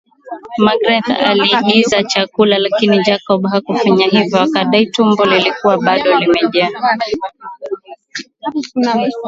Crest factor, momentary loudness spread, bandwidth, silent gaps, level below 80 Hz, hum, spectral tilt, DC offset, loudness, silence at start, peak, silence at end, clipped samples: 14 dB; 15 LU; 7.8 kHz; none; -54 dBFS; none; -5 dB/octave; under 0.1%; -13 LUFS; 0.25 s; 0 dBFS; 0 s; under 0.1%